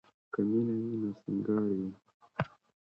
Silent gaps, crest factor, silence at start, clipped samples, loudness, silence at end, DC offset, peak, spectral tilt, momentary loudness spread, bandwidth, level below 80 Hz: 2.14-2.20 s; 20 dB; 0.35 s; under 0.1%; -34 LUFS; 0.4 s; under 0.1%; -14 dBFS; -10 dB/octave; 10 LU; 5.6 kHz; -68 dBFS